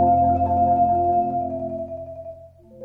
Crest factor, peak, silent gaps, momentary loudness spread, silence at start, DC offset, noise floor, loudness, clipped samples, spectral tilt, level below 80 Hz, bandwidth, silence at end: 14 dB; -8 dBFS; none; 17 LU; 0 s; under 0.1%; -44 dBFS; -21 LUFS; under 0.1%; -12 dB/octave; -44 dBFS; 2.8 kHz; 0 s